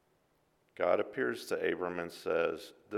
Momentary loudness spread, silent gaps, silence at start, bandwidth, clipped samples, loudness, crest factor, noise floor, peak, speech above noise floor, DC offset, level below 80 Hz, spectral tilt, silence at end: 7 LU; none; 0.8 s; 16 kHz; under 0.1%; -34 LUFS; 22 dB; -73 dBFS; -14 dBFS; 39 dB; under 0.1%; -74 dBFS; -5 dB/octave; 0 s